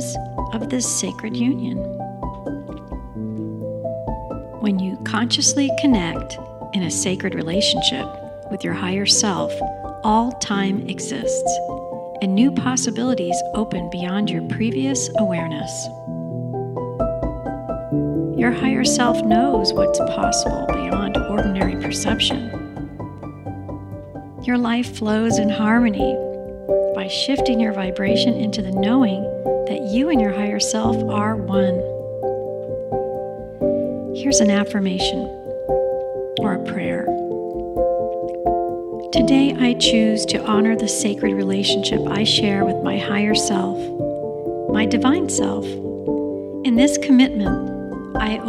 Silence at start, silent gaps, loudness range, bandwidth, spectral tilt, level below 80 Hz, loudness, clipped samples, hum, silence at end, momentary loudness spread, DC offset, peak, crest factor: 0 s; none; 5 LU; 13 kHz; -4 dB/octave; -40 dBFS; -20 LUFS; under 0.1%; none; 0 s; 12 LU; under 0.1%; -2 dBFS; 18 dB